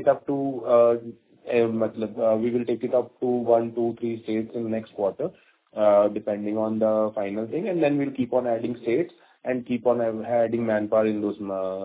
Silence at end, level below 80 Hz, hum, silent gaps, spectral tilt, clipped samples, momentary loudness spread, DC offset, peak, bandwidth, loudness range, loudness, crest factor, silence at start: 0 s; -66 dBFS; none; none; -11 dB/octave; under 0.1%; 9 LU; under 0.1%; -6 dBFS; 4 kHz; 2 LU; -25 LUFS; 18 dB; 0 s